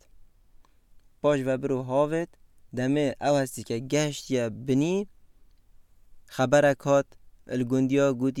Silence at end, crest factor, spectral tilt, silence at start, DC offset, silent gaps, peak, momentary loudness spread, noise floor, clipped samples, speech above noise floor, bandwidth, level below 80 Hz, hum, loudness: 0 s; 18 dB; -6 dB/octave; 1.25 s; under 0.1%; none; -8 dBFS; 11 LU; -55 dBFS; under 0.1%; 30 dB; 14.5 kHz; -58 dBFS; none; -26 LUFS